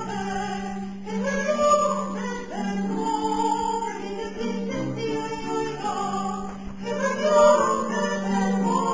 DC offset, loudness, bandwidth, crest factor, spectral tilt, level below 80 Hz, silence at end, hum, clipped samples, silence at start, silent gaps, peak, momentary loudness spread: 0.7%; -25 LUFS; 8 kHz; 18 dB; -5 dB/octave; -52 dBFS; 0 s; none; under 0.1%; 0 s; none; -6 dBFS; 11 LU